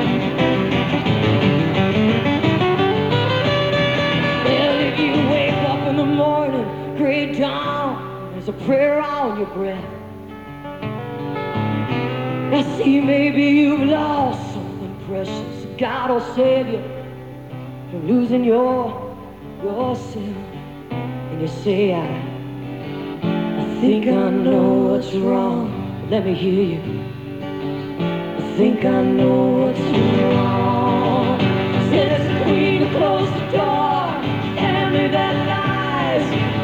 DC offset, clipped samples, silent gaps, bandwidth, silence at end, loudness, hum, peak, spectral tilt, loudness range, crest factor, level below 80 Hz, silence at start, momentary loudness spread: 0.2%; under 0.1%; none; 16 kHz; 0 s; -19 LUFS; none; -4 dBFS; -7.5 dB/octave; 6 LU; 14 dB; -48 dBFS; 0 s; 13 LU